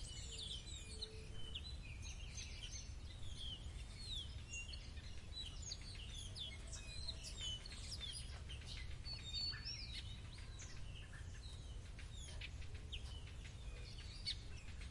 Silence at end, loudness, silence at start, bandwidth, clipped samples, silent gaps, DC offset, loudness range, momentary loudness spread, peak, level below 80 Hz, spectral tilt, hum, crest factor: 0 s; -50 LUFS; 0 s; 11.5 kHz; under 0.1%; none; under 0.1%; 5 LU; 8 LU; -32 dBFS; -54 dBFS; -2.5 dB/octave; none; 16 dB